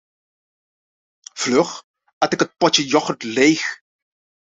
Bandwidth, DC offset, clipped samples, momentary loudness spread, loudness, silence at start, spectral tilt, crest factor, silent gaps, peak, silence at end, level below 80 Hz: 8 kHz; under 0.1%; under 0.1%; 15 LU; -18 LUFS; 1.35 s; -3 dB/octave; 20 dB; 1.84-1.94 s, 2.13-2.21 s; -2 dBFS; 0.7 s; -64 dBFS